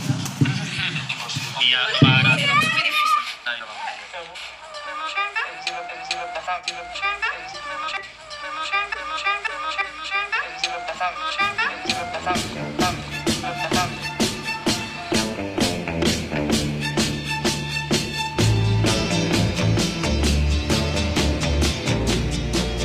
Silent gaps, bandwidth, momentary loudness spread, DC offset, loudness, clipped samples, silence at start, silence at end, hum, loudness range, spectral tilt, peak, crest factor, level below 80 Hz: none; 15.5 kHz; 11 LU; under 0.1%; -22 LUFS; under 0.1%; 0 s; 0 s; none; 8 LU; -4 dB/octave; -2 dBFS; 22 dB; -34 dBFS